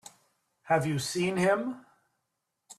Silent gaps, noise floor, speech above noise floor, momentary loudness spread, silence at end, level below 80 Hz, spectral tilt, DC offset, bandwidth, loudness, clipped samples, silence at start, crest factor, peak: none; -82 dBFS; 54 dB; 9 LU; 0.05 s; -70 dBFS; -5 dB/octave; under 0.1%; 14 kHz; -29 LUFS; under 0.1%; 0.65 s; 18 dB; -14 dBFS